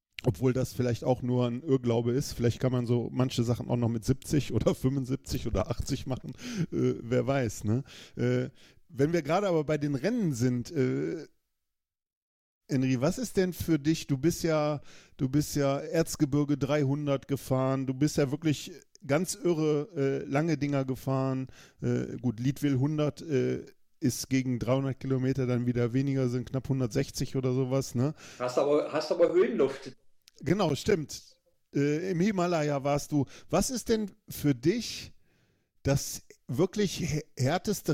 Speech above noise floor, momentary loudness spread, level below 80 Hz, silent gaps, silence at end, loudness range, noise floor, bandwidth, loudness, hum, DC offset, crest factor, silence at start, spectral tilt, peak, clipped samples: 56 dB; 6 LU; -52 dBFS; 12.17-12.61 s; 0 s; 3 LU; -85 dBFS; 16.5 kHz; -30 LUFS; none; under 0.1%; 18 dB; 0.2 s; -6.5 dB/octave; -12 dBFS; under 0.1%